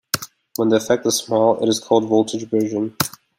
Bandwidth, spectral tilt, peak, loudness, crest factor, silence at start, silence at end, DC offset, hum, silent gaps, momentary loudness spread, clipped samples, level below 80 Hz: 16.5 kHz; -4 dB/octave; 0 dBFS; -19 LUFS; 18 dB; 0.15 s; 0.3 s; under 0.1%; none; none; 7 LU; under 0.1%; -62 dBFS